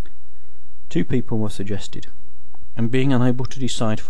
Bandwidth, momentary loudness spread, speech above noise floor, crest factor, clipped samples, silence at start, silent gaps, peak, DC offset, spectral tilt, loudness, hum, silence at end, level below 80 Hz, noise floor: 12 kHz; 14 LU; 27 dB; 18 dB; under 0.1%; 0.05 s; none; -2 dBFS; 20%; -6.5 dB/octave; -23 LUFS; none; 0 s; -42 dBFS; -49 dBFS